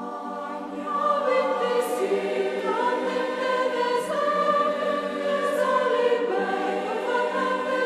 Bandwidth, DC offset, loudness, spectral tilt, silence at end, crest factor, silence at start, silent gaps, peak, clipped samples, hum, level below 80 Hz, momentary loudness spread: 14 kHz; under 0.1%; -25 LUFS; -4 dB/octave; 0 s; 16 dB; 0 s; none; -10 dBFS; under 0.1%; none; -70 dBFS; 5 LU